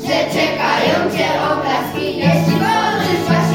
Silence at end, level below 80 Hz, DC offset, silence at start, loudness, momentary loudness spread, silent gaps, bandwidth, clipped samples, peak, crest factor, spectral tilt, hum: 0 s; -52 dBFS; under 0.1%; 0 s; -16 LUFS; 3 LU; none; 17 kHz; under 0.1%; -2 dBFS; 14 dB; -5.5 dB/octave; none